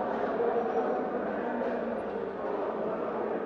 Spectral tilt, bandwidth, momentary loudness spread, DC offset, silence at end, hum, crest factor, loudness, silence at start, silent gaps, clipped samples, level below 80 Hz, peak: -8 dB/octave; 6.4 kHz; 5 LU; under 0.1%; 0 s; none; 14 dB; -32 LUFS; 0 s; none; under 0.1%; -64 dBFS; -16 dBFS